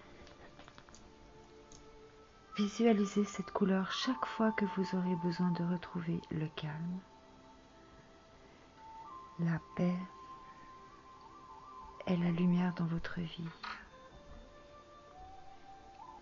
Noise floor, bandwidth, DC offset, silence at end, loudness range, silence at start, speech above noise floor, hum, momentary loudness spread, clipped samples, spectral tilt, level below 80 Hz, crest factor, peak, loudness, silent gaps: -59 dBFS; 7.4 kHz; under 0.1%; 0 s; 10 LU; 0 s; 25 dB; none; 24 LU; under 0.1%; -6 dB/octave; -64 dBFS; 20 dB; -18 dBFS; -36 LUFS; none